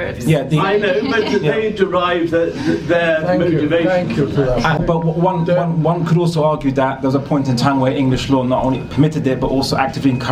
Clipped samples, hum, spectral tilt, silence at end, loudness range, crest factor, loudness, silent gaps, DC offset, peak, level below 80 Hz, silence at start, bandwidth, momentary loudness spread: under 0.1%; none; -7 dB/octave; 0 s; 1 LU; 16 dB; -16 LUFS; none; under 0.1%; 0 dBFS; -38 dBFS; 0 s; 14 kHz; 2 LU